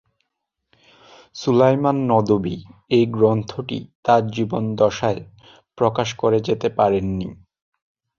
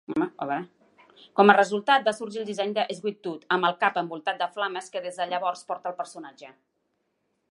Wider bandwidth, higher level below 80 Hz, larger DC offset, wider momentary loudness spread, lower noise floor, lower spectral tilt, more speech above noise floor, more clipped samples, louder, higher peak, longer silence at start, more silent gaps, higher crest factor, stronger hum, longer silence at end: second, 7.4 kHz vs 11.5 kHz; first, -50 dBFS vs -78 dBFS; neither; about the same, 12 LU vs 14 LU; about the same, -78 dBFS vs -75 dBFS; first, -7 dB/octave vs -4.5 dB/octave; first, 59 dB vs 49 dB; neither; first, -20 LUFS vs -26 LUFS; about the same, -2 dBFS vs -2 dBFS; first, 1.35 s vs 0.1 s; first, 3.95-4.03 s vs none; second, 18 dB vs 24 dB; neither; second, 0.85 s vs 1 s